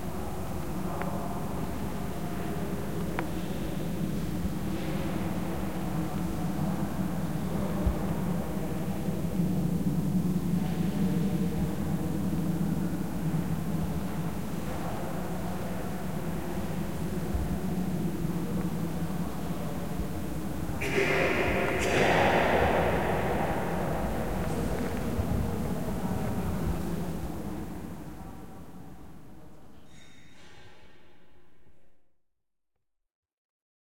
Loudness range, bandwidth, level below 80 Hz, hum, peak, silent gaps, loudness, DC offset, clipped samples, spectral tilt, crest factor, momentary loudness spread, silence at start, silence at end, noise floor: 8 LU; 16.5 kHz; -44 dBFS; none; -12 dBFS; 33.15-33.23 s, 33.33-33.60 s; -31 LUFS; 2%; under 0.1%; -6.5 dB/octave; 20 dB; 9 LU; 0 s; 0.35 s; -88 dBFS